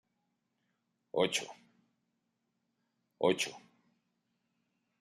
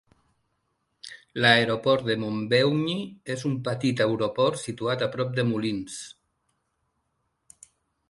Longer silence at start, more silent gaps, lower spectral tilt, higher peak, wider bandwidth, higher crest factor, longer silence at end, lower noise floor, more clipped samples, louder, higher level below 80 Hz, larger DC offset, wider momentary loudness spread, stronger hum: about the same, 1.15 s vs 1.05 s; neither; second, -3 dB/octave vs -5 dB/octave; second, -14 dBFS vs -4 dBFS; first, 13 kHz vs 11.5 kHz; about the same, 26 dB vs 24 dB; second, 1.4 s vs 2 s; first, -82 dBFS vs -76 dBFS; neither; second, -34 LUFS vs -25 LUFS; second, -84 dBFS vs -64 dBFS; neither; second, 8 LU vs 17 LU; neither